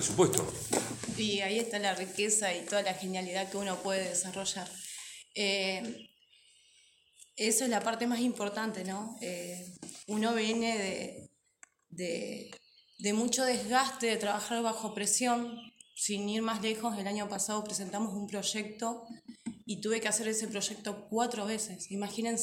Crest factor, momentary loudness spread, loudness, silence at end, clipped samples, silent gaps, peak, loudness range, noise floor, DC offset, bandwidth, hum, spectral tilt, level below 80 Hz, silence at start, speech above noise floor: 28 dB; 13 LU; -33 LUFS; 0 s; under 0.1%; none; -6 dBFS; 4 LU; -65 dBFS; under 0.1%; 17 kHz; none; -2.5 dB/octave; -72 dBFS; 0 s; 32 dB